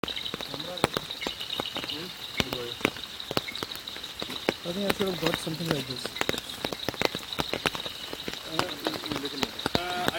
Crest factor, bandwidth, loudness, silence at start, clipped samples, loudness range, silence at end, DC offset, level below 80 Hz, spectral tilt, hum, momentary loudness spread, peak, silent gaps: 30 dB; 19 kHz; -31 LUFS; 0.05 s; under 0.1%; 2 LU; 0 s; under 0.1%; -56 dBFS; -3.5 dB/octave; none; 6 LU; 0 dBFS; none